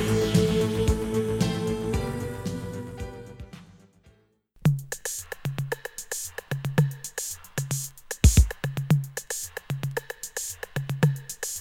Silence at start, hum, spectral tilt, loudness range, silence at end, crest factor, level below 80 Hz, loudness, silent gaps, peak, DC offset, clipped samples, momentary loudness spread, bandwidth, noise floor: 0 s; none; -5 dB/octave; 7 LU; 0 s; 22 dB; -34 dBFS; -28 LUFS; none; -6 dBFS; under 0.1%; under 0.1%; 12 LU; 17.5 kHz; -61 dBFS